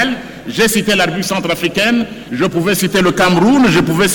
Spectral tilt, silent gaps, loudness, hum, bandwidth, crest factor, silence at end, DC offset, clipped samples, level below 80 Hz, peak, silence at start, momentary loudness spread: -4.5 dB/octave; none; -13 LUFS; none; 19 kHz; 10 dB; 0 s; under 0.1%; under 0.1%; -42 dBFS; -4 dBFS; 0 s; 8 LU